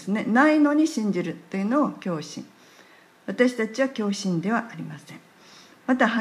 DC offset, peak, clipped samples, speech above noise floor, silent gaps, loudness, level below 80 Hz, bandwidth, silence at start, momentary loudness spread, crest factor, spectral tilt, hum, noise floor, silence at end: under 0.1%; -6 dBFS; under 0.1%; 30 dB; none; -23 LUFS; -78 dBFS; 12.5 kHz; 0 s; 19 LU; 18 dB; -5.5 dB/octave; none; -53 dBFS; 0 s